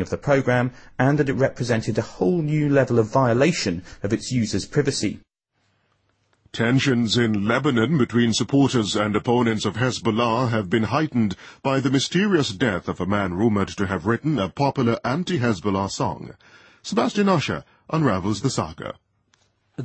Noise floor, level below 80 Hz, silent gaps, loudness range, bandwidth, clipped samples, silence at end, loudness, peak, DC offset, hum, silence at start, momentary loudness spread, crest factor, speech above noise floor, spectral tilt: -70 dBFS; -52 dBFS; none; 4 LU; 8.8 kHz; under 0.1%; 0 s; -22 LUFS; -6 dBFS; under 0.1%; none; 0 s; 8 LU; 16 dB; 49 dB; -5.5 dB/octave